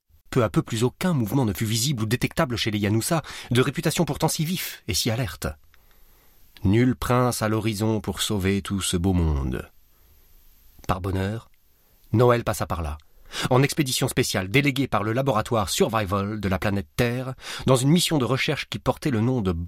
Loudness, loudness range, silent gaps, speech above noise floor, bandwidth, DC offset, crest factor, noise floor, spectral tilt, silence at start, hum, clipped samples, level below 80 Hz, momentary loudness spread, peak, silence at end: -24 LUFS; 4 LU; none; 35 dB; 16.5 kHz; under 0.1%; 18 dB; -58 dBFS; -5 dB/octave; 0.3 s; none; under 0.1%; -42 dBFS; 8 LU; -6 dBFS; 0 s